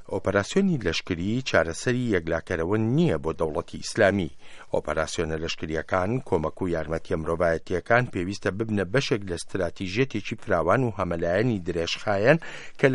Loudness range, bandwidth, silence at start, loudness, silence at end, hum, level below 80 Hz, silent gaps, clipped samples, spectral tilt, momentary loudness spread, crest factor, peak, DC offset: 2 LU; 11.5 kHz; 0 s; -26 LUFS; 0 s; none; -48 dBFS; none; under 0.1%; -5.5 dB/octave; 7 LU; 22 dB; -4 dBFS; under 0.1%